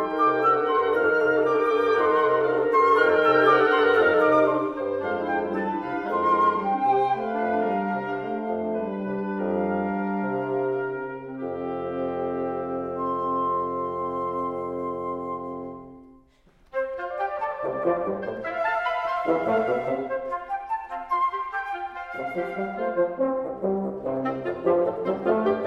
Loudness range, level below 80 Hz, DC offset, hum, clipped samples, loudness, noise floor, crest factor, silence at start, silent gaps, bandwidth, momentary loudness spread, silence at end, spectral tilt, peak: 10 LU; -60 dBFS; under 0.1%; none; under 0.1%; -25 LUFS; -58 dBFS; 20 dB; 0 s; none; 6.8 kHz; 12 LU; 0 s; -7.5 dB/octave; -6 dBFS